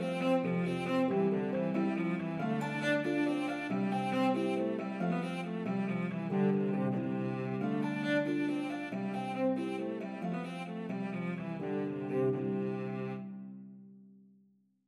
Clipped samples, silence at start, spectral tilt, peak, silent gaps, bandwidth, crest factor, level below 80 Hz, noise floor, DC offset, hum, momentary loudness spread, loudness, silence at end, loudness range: under 0.1%; 0 s; -7.5 dB/octave; -20 dBFS; none; 11.5 kHz; 14 dB; -80 dBFS; -69 dBFS; under 0.1%; none; 7 LU; -34 LUFS; 0.8 s; 4 LU